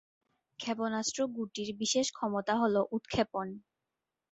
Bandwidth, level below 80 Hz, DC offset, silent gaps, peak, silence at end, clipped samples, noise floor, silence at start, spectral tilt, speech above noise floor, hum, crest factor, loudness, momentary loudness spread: 8.4 kHz; -66 dBFS; under 0.1%; none; -16 dBFS; 0.7 s; under 0.1%; -89 dBFS; 0.6 s; -3.5 dB/octave; 56 dB; none; 18 dB; -33 LUFS; 9 LU